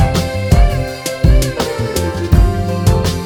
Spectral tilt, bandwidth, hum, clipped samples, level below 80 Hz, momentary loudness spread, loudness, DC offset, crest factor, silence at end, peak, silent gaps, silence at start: -6 dB/octave; 18.5 kHz; none; under 0.1%; -16 dBFS; 5 LU; -15 LUFS; under 0.1%; 12 dB; 0 s; 0 dBFS; none; 0 s